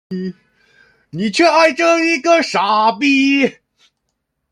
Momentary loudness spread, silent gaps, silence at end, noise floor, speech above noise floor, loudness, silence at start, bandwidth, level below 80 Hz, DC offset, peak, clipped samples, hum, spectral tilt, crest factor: 14 LU; none; 1 s; -72 dBFS; 58 dB; -13 LUFS; 0.1 s; 11 kHz; -64 dBFS; under 0.1%; -2 dBFS; under 0.1%; none; -4 dB/octave; 14 dB